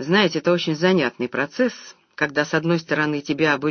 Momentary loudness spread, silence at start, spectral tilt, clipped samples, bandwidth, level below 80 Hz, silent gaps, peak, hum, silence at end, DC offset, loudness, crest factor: 6 LU; 0 s; -5.5 dB/octave; under 0.1%; 6.6 kHz; -64 dBFS; none; -2 dBFS; none; 0 s; under 0.1%; -21 LUFS; 18 dB